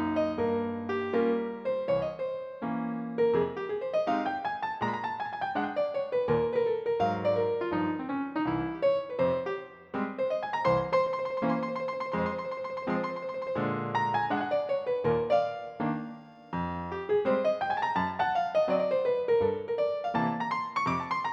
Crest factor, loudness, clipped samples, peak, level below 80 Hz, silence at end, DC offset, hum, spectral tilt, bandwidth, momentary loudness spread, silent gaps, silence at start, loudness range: 16 dB; -30 LUFS; under 0.1%; -14 dBFS; -62 dBFS; 0 s; under 0.1%; none; -7.5 dB/octave; 7.4 kHz; 7 LU; none; 0 s; 3 LU